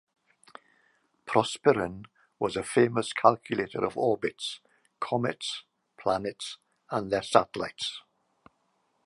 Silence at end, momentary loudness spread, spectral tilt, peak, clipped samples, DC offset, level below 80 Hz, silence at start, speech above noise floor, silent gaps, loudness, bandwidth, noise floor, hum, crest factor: 1.05 s; 15 LU; -4.5 dB/octave; -4 dBFS; under 0.1%; under 0.1%; -64 dBFS; 1.25 s; 45 dB; none; -29 LUFS; 11.5 kHz; -73 dBFS; none; 26 dB